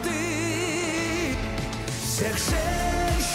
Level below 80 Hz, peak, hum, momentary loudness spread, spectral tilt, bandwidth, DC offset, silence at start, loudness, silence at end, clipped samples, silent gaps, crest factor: -34 dBFS; -14 dBFS; none; 5 LU; -4 dB/octave; 16 kHz; under 0.1%; 0 s; -26 LUFS; 0 s; under 0.1%; none; 12 dB